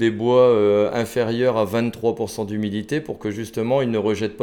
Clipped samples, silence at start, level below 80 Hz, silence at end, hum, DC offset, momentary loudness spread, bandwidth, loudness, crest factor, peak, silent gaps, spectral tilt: under 0.1%; 0 s; -56 dBFS; 0 s; none; under 0.1%; 11 LU; 18 kHz; -21 LUFS; 16 dB; -4 dBFS; none; -6.5 dB/octave